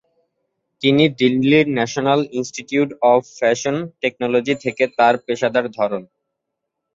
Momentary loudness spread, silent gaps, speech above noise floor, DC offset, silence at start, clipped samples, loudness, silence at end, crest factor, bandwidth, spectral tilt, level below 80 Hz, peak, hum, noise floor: 8 LU; none; 61 dB; under 0.1%; 0.8 s; under 0.1%; -18 LUFS; 0.9 s; 16 dB; 7.8 kHz; -5 dB/octave; -62 dBFS; -2 dBFS; none; -79 dBFS